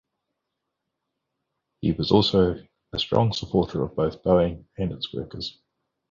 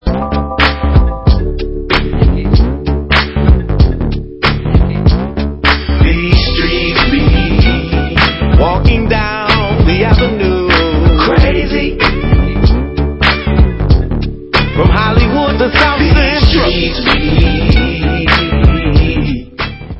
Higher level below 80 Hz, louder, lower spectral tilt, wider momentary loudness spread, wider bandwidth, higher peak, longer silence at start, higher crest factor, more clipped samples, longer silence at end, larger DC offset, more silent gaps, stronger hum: second, -46 dBFS vs -14 dBFS; second, -24 LUFS vs -11 LUFS; about the same, -7 dB/octave vs -8 dB/octave; first, 13 LU vs 5 LU; first, 7.6 kHz vs 6.2 kHz; second, -6 dBFS vs 0 dBFS; first, 1.8 s vs 0.05 s; first, 20 dB vs 10 dB; second, under 0.1% vs 0.4%; first, 0.6 s vs 0 s; neither; neither; neither